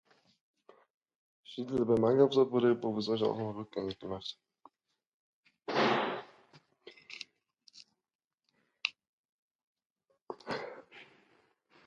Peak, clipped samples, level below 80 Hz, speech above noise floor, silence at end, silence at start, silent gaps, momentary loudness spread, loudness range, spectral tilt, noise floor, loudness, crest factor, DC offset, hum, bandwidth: -12 dBFS; under 0.1%; -72 dBFS; 49 dB; 0.85 s; 1.5 s; 5.07-5.43 s, 8.15-8.19 s, 9.09-9.75 s, 9.86-9.96 s, 10.22-10.26 s; 21 LU; 15 LU; -6.5 dB/octave; -80 dBFS; -32 LUFS; 22 dB; under 0.1%; none; 7.6 kHz